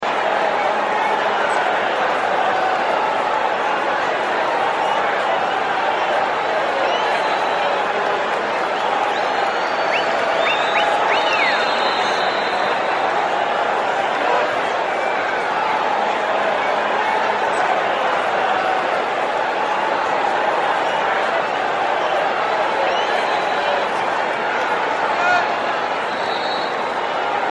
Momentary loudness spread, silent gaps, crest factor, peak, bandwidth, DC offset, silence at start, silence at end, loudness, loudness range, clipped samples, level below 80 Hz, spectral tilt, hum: 3 LU; none; 14 dB; -4 dBFS; 11 kHz; under 0.1%; 0 s; 0 s; -18 LUFS; 2 LU; under 0.1%; -60 dBFS; -3 dB/octave; none